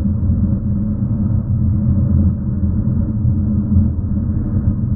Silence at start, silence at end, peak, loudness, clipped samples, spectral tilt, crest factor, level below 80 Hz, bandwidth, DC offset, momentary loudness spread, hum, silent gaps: 0 s; 0 s; -2 dBFS; -17 LUFS; under 0.1%; -16.5 dB/octave; 12 dB; -24 dBFS; 1.8 kHz; under 0.1%; 4 LU; none; none